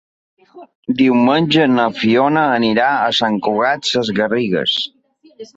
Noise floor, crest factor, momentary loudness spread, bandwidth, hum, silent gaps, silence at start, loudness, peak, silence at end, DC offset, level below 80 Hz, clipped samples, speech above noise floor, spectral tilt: -38 dBFS; 14 dB; 5 LU; 8 kHz; none; 0.75-0.83 s; 0.55 s; -15 LUFS; -2 dBFS; 0.1 s; under 0.1%; -58 dBFS; under 0.1%; 23 dB; -5 dB/octave